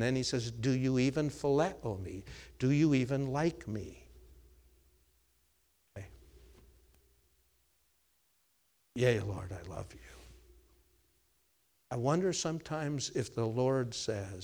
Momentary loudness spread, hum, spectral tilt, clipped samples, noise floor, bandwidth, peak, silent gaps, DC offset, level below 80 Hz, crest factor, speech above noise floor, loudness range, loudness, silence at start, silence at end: 20 LU; none; -6 dB/octave; under 0.1%; -75 dBFS; over 20 kHz; -16 dBFS; none; under 0.1%; -60 dBFS; 20 dB; 42 dB; 9 LU; -33 LUFS; 0 s; 0 s